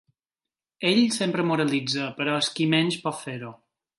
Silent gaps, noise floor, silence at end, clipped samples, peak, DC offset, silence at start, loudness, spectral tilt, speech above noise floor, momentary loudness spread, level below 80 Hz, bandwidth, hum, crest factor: none; under -90 dBFS; 0.45 s; under 0.1%; -6 dBFS; under 0.1%; 0.8 s; -24 LUFS; -4.5 dB/octave; over 66 dB; 13 LU; -72 dBFS; 11.5 kHz; none; 20 dB